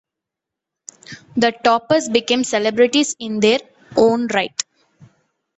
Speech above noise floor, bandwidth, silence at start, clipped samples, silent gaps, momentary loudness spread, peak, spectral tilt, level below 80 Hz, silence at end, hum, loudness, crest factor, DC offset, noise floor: 67 dB; 8.2 kHz; 1.1 s; under 0.1%; none; 11 LU; -2 dBFS; -3 dB/octave; -60 dBFS; 0.95 s; none; -17 LUFS; 18 dB; under 0.1%; -84 dBFS